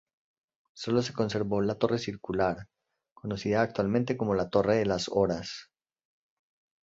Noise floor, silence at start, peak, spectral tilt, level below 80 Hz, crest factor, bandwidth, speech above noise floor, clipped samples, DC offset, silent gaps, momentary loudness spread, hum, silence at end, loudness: -63 dBFS; 0.75 s; -10 dBFS; -6 dB/octave; -58 dBFS; 20 dB; 8 kHz; 35 dB; under 0.1%; under 0.1%; 3.12-3.16 s; 12 LU; none; 1.2 s; -29 LUFS